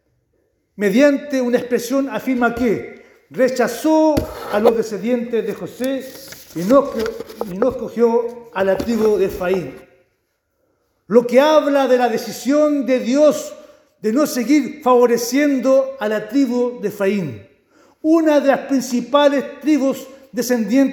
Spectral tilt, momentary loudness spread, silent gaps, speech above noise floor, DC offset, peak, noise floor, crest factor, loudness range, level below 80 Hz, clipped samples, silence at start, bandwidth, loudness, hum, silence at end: -5 dB/octave; 11 LU; none; 52 dB; under 0.1%; 0 dBFS; -68 dBFS; 18 dB; 4 LU; -48 dBFS; under 0.1%; 0.8 s; over 20 kHz; -17 LUFS; none; 0 s